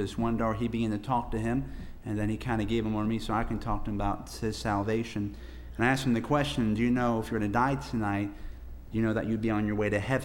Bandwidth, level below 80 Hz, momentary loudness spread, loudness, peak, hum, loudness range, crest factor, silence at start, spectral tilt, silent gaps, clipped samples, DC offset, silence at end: 16 kHz; -42 dBFS; 9 LU; -30 LUFS; -12 dBFS; none; 3 LU; 18 dB; 0 s; -6.5 dB/octave; none; under 0.1%; under 0.1%; 0 s